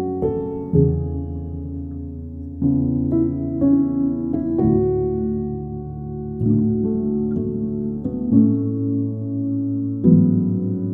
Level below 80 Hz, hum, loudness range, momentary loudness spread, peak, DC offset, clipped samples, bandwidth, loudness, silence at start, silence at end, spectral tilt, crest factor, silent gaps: -38 dBFS; none; 3 LU; 13 LU; -2 dBFS; under 0.1%; under 0.1%; 2 kHz; -21 LUFS; 0 s; 0 s; -15 dB/octave; 18 dB; none